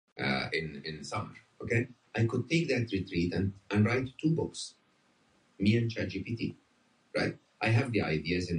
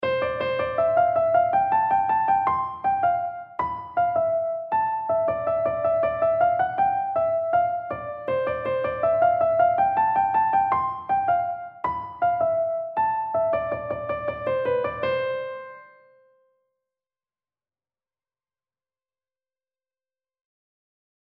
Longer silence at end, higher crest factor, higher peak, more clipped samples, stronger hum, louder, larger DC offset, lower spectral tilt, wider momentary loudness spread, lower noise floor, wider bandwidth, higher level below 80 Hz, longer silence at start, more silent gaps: second, 0 s vs 5.5 s; about the same, 18 dB vs 14 dB; second, -14 dBFS vs -10 dBFS; neither; neither; second, -32 LUFS vs -23 LUFS; neither; second, -6.5 dB/octave vs -8.5 dB/octave; about the same, 10 LU vs 9 LU; second, -69 dBFS vs under -90 dBFS; first, 10 kHz vs 5.2 kHz; about the same, -54 dBFS vs -56 dBFS; first, 0.15 s vs 0 s; neither